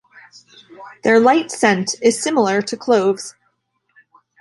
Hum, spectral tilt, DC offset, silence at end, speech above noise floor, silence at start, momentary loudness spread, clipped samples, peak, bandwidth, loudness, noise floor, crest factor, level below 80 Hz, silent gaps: none; -4 dB/octave; under 0.1%; 1.1 s; 50 dB; 0.8 s; 9 LU; under 0.1%; -2 dBFS; 11.5 kHz; -16 LUFS; -67 dBFS; 16 dB; -66 dBFS; none